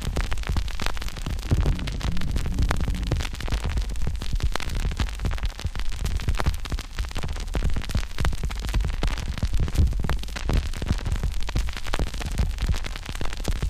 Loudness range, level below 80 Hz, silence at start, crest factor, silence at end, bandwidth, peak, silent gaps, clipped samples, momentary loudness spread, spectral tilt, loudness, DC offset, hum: 2 LU; -26 dBFS; 0 s; 22 dB; 0 s; 15.5 kHz; -2 dBFS; none; under 0.1%; 6 LU; -5 dB/octave; -29 LUFS; 0.2%; none